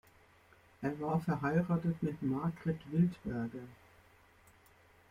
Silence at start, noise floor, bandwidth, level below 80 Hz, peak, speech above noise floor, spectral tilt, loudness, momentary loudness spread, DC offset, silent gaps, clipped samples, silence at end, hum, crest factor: 0.8 s; -64 dBFS; 9.6 kHz; -64 dBFS; -20 dBFS; 30 dB; -9.5 dB/octave; -36 LUFS; 9 LU; under 0.1%; none; under 0.1%; 1.35 s; none; 18 dB